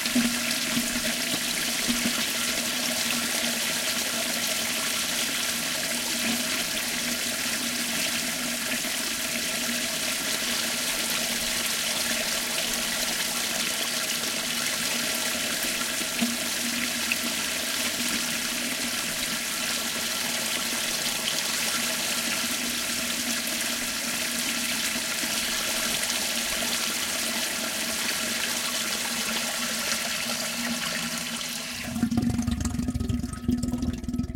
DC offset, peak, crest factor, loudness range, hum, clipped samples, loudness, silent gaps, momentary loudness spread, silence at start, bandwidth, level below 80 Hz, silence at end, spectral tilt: under 0.1%; -8 dBFS; 20 dB; 2 LU; none; under 0.1%; -25 LUFS; none; 2 LU; 0 s; 17 kHz; -48 dBFS; 0 s; -1.5 dB/octave